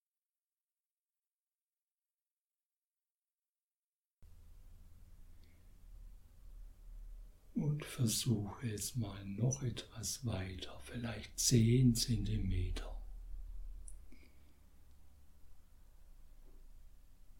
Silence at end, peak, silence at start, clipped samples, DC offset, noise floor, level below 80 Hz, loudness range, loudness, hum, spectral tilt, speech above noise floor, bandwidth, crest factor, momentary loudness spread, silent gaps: 0 s; -18 dBFS; 4.2 s; under 0.1%; under 0.1%; under -90 dBFS; -52 dBFS; 14 LU; -37 LUFS; none; -5 dB/octave; over 54 dB; 17.5 kHz; 22 dB; 27 LU; none